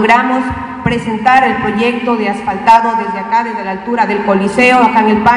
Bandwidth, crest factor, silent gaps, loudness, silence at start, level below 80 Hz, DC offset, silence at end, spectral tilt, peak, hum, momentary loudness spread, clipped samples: 12 kHz; 12 dB; none; -12 LUFS; 0 s; -42 dBFS; under 0.1%; 0 s; -5.5 dB/octave; 0 dBFS; none; 8 LU; 0.9%